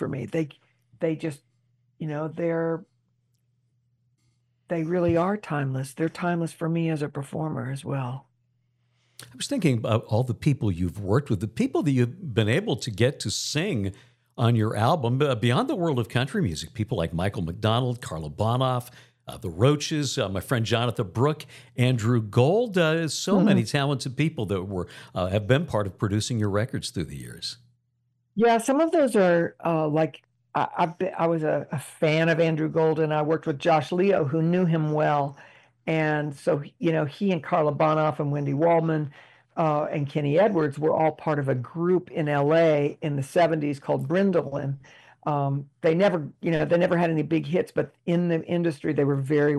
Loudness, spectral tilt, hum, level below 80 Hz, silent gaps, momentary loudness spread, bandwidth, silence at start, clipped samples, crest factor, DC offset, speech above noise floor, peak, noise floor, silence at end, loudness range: -25 LUFS; -6.5 dB/octave; none; -56 dBFS; none; 10 LU; 14 kHz; 0 s; under 0.1%; 20 dB; under 0.1%; 48 dB; -6 dBFS; -72 dBFS; 0 s; 6 LU